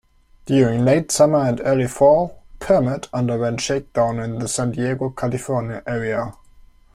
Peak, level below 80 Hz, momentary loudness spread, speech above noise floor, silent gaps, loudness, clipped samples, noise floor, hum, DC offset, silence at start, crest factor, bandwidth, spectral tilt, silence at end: -4 dBFS; -46 dBFS; 10 LU; 29 dB; none; -19 LUFS; under 0.1%; -48 dBFS; none; under 0.1%; 0.45 s; 16 dB; 15.5 kHz; -5.5 dB/octave; 0.65 s